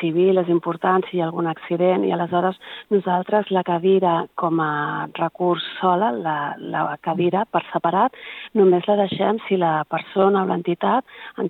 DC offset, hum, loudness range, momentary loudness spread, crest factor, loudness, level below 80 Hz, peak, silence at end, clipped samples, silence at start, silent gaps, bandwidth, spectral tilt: under 0.1%; none; 2 LU; 7 LU; 16 dB; -21 LUFS; -74 dBFS; -4 dBFS; 0 s; under 0.1%; 0 s; none; 4.1 kHz; -9 dB/octave